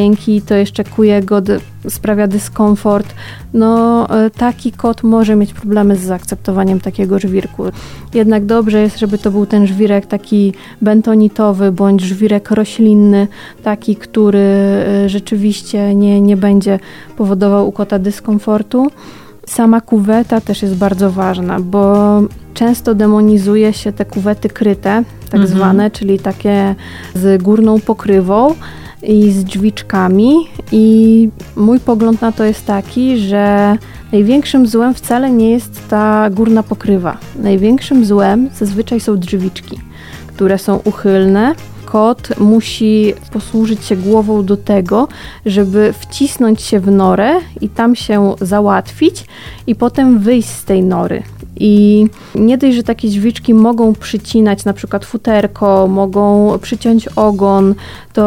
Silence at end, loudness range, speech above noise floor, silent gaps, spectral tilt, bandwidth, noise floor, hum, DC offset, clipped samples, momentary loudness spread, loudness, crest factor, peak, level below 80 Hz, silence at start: 0 s; 3 LU; 20 dB; none; -7 dB/octave; 15.5 kHz; -30 dBFS; none; under 0.1%; under 0.1%; 8 LU; -11 LUFS; 10 dB; 0 dBFS; -38 dBFS; 0 s